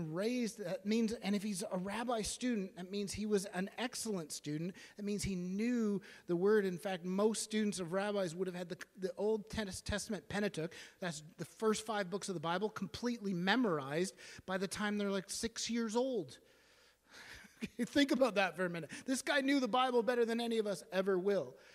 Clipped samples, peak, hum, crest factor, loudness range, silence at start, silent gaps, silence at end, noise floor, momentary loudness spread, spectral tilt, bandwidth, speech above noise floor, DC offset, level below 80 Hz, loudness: under 0.1%; -16 dBFS; none; 22 dB; 5 LU; 0 s; none; 0.2 s; -68 dBFS; 11 LU; -4.5 dB/octave; 15.5 kHz; 31 dB; under 0.1%; -64 dBFS; -37 LUFS